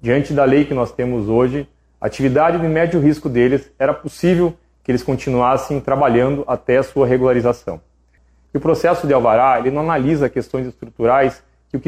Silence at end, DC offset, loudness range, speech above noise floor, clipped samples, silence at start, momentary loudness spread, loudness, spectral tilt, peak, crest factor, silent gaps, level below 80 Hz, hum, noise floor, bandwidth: 0.05 s; under 0.1%; 1 LU; 39 dB; under 0.1%; 0.05 s; 11 LU; -17 LUFS; -7.5 dB/octave; -4 dBFS; 14 dB; none; -42 dBFS; none; -55 dBFS; 14.5 kHz